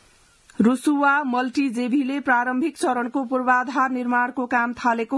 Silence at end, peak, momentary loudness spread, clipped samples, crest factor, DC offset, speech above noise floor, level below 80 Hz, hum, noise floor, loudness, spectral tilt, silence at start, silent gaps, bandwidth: 0 s; -6 dBFS; 4 LU; under 0.1%; 16 dB; under 0.1%; 34 dB; -66 dBFS; none; -55 dBFS; -21 LUFS; -5 dB/octave; 0.6 s; none; 12 kHz